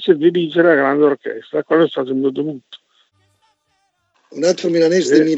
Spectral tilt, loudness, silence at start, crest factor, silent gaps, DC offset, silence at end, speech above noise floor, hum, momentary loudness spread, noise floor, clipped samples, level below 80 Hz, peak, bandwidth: -5.5 dB/octave; -16 LUFS; 0 s; 16 dB; none; under 0.1%; 0 s; 51 dB; none; 11 LU; -66 dBFS; under 0.1%; -78 dBFS; 0 dBFS; 8.2 kHz